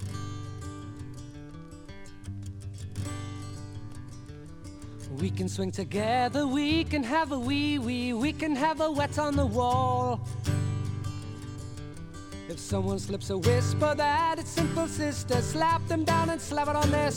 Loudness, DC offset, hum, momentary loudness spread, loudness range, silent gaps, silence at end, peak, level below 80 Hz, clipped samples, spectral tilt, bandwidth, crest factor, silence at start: -29 LUFS; under 0.1%; none; 18 LU; 13 LU; none; 0 s; -10 dBFS; -48 dBFS; under 0.1%; -5.5 dB/octave; 17 kHz; 18 dB; 0 s